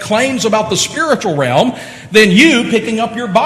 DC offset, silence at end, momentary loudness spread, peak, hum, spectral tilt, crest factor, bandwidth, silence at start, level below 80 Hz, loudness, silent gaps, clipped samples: under 0.1%; 0 s; 10 LU; 0 dBFS; none; -4 dB/octave; 12 dB; 13.5 kHz; 0 s; -48 dBFS; -12 LUFS; none; 0.3%